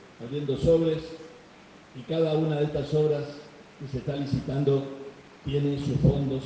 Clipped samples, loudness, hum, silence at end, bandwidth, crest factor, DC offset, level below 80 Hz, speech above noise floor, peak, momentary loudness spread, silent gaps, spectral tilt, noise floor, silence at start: under 0.1%; -27 LUFS; none; 0 s; 8.4 kHz; 18 dB; under 0.1%; -46 dBFS; 25 dB; -10 dBFS; 20 LU; none; -8.5 dB/octave; -51 dBFS; 0 s